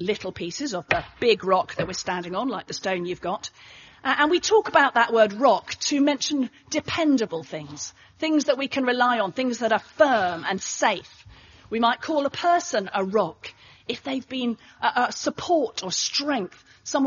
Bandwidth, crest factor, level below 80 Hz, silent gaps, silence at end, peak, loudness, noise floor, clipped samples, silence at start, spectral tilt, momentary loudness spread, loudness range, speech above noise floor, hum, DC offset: 7.4 kHz; 20 dB; -60 dBFS; none; 0 s; -4 dBFS; -24 LUFS; -49 dBFS; under 0.1%; 0 s; -2 dB/octave; 12 LU; 5 LU; 25 dB; none; under 0.1%